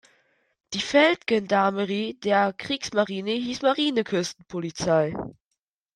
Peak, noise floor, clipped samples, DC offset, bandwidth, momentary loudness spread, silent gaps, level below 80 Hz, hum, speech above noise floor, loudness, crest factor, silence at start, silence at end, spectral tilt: -6 dBFS; -82 dBFS; under 0.1%; under 0.1%; 11.5 kHz; 12 LU; none; -62 dBFS; none; 58 dB; -24 LUFS; 20 dB; 0.7 s; 0.65 s; -4.5 dB/octave